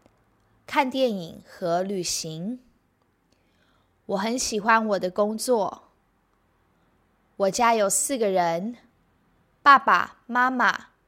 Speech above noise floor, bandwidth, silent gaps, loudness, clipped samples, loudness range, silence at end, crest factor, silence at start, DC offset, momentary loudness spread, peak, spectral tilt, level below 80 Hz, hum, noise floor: 44 dB; 16 kHz; none; -23 LUFS; under 0.1%; 8 LU; 0.25 s; 22 dB; 0.7 s; under 0.1%; 14 LU; -2 dBFS; -3 dB/octave; -64 dBFS; none; -67 dBFS